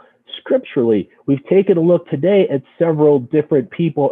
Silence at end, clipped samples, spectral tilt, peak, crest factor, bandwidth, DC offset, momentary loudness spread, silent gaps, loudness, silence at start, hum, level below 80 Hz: 0 s; under 0.1%; -10.5 dB/octave; -2 dBFS; 14 dB; 3.9 kHz; under 0.1%; 7 LU; none; -16 LUFS; 0.3 s; none; -62 dBFS